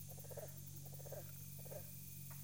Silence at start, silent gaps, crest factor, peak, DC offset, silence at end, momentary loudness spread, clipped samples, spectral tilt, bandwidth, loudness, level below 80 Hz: 0 s; none; 16 dB; -36 dBFS; under 0.1%; 0 s; 1 LU; under 0.1%; -4.5 dB/octave; 17 kHz; -51 LUFS; -74 dBFS